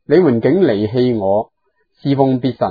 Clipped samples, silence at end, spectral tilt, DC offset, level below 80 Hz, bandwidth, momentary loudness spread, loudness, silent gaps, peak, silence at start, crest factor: under 0.1%; 0 s; -10 dB/octave; under 0.1%; -54 dBFS; 5 kHz; 7 LU; -15 LUFS; none; 0 dBFS; 0.1 s; 14 dB